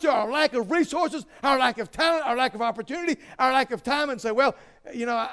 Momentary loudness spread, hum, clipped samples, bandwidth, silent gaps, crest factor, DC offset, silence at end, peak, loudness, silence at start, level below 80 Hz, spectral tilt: 7 LU; none; under 0.1%; 11 kHz; none; 16 dB; under 0.1%; 0 s; -8 dBFS; -24 LUFS; 0 s; -58 dBFS; -3.5 dB/octave